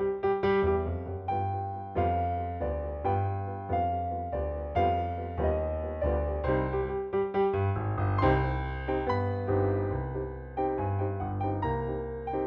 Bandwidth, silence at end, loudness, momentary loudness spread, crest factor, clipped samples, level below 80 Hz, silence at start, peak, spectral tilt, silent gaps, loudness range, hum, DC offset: 5.4 kHz; 0 s; -30 LUFS; 7 LU; 16 dB; under 0.1%; -40 dBFS; 0 s; -14 dBFS; -10 dB/octave; none; 2 LU; none; under 0.1%